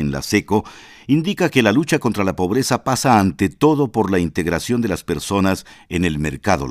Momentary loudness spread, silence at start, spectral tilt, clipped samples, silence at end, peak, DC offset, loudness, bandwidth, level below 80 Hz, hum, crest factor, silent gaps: 7 LU; 0 s; -5.5 dB/octave; under 0.1%; 0 s; 0 dBFS; under 0.1%; -18 LUFS; 16 kHz; -42 dBFS; none; 18 dB; none